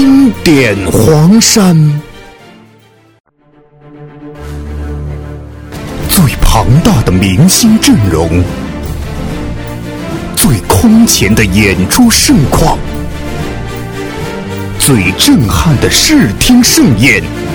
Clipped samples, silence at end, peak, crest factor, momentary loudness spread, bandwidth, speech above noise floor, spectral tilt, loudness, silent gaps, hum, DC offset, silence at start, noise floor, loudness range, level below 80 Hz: 0.9%; 0 s; 0 dBFS; 8 dB; 16 LU; over 20 kHz; 38 dB; -4.5 dB/octave; -8 LUFS; 3.20-3.24 s; none; under 0.1%; 0 s; -44 dBFS; 10 LU; -20 dBFS